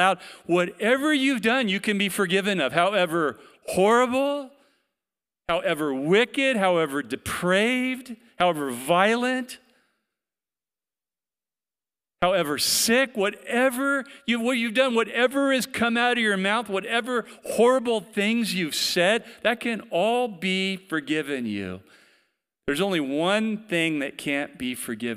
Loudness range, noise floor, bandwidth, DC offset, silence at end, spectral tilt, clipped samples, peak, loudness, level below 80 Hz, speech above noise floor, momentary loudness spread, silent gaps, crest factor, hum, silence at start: 5 LU; under -90 dBFS; 16 kHz; under 0.1%; 0 s; -3.5 dB/octave; under 0.1%; -4 dBFS; -23 LUFS; -62 dBFS; over 66 dB; 9 LU; none; 20 dB; none; 0 s